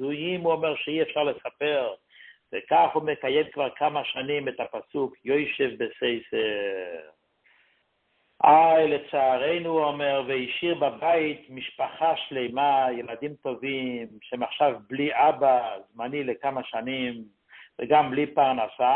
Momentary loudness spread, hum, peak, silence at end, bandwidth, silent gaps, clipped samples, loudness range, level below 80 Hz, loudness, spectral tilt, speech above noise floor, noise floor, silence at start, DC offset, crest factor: 12 LU; none; -4 dBFS; 0 s; 4.2 kHz; none; under 0.1%; 5 LU; -70 dBFS; -25 LUFS; -9 dB/octave; 46 dB; -70 dBFS; 0 s; under 0.1%; 20 dB